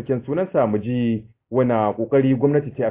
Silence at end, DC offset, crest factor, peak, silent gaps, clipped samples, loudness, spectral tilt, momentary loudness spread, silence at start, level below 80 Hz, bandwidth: 0 s; under 0.1%; 16 dB; -4 dBFS; none; under 0.1%; -21 LUFS; -12.5 dB/octave; 6 LU; 0 s; -54 dBFS; 3.8 kHz